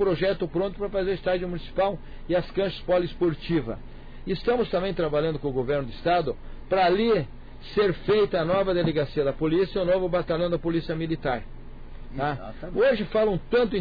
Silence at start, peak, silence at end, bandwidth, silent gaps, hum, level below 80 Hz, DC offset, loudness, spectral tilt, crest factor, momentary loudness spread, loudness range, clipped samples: 0 s; -14 dBFS; 0 s; 5 kHz; none; none; -40 dBFS; under 0.1%; -26 LUFS; -9 dB/octave; 12 dB; 10 LU; 3 LU; under 0.1%